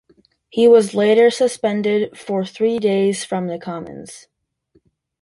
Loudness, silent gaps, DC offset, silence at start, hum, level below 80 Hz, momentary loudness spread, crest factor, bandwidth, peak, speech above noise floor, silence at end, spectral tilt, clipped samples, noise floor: -17 LUFS; none; under 0.1%; 0.55 s; none; -62 dBFS; 17 LU; 16 dB; 11.5 kHz; -2 dBFS; 44 dB; 1.05 s; -5 dB/octave; under 0.1%; -61 dBFS